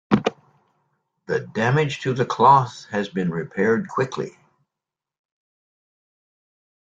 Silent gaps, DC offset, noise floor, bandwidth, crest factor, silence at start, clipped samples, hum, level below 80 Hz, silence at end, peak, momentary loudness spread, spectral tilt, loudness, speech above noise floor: none; under 0.1%; -87 dBFS; 7.8 kHz; 22 dB; 0.1 s; under 0.1%; none; -60 dBFS; 2.5 s; -2 dBFS; 12 LU; -6.5 dB/octave; -21 LUFS; 66 dB